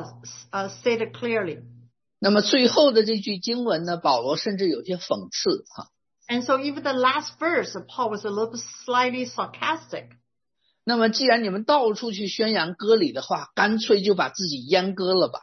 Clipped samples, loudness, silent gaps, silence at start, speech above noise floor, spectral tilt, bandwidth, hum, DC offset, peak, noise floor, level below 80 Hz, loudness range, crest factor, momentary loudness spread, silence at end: under 0.1%; -23 LUFS; none; 0 s; 51 dB; -4 dB/octave; 6.4 kHz; none; under 0.1%; -4 dBFS; -74 dBFS; -72 dBFS; 4 LU; 18 dB; 12 LU; 0.05 s